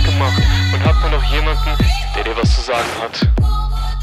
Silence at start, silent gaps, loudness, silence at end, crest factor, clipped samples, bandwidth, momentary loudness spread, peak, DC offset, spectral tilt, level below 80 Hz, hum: 0 s; none; -16 LUFS; 0 s; 12 dB; under 0.1%; 13 kHz; 5 LU; -2 dBFS; under 0.1%; -5.5 dB/octave; -16 dBFS; none